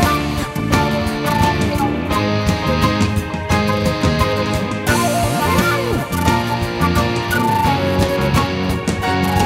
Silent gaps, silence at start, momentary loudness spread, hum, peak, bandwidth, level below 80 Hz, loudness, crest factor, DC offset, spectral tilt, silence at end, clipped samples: none; 0 s; 4 LU; none; 0 dBFS; 16.5 kHz; -30 dBFS; -17 LUFS; 16 dB; under 0.1%; -5.5 dB/octave; 0 s; under 0.1%